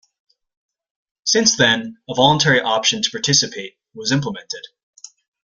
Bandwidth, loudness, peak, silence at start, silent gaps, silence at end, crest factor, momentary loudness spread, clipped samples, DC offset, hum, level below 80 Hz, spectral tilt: 10.5 kHz; -16 LUFS; 0 dBFS; 1.25 s; none; 0.8 s; 20 dB; 17 LU; under 0.1%; under 0.1%; none; -56 dBFS; -2.5 dB/octave